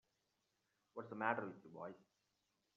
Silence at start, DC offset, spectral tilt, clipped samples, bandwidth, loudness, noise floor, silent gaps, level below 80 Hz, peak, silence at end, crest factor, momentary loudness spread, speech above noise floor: 0.95 s; under 0.1%; -4.5 dB/octave; under 0.1%; 7.2 kHz; -46 LUFS; -86 dBFS; none; under -90 dBFS; -22 dBFS; 0.75 s; 26 dB; 15 LU; 40 dB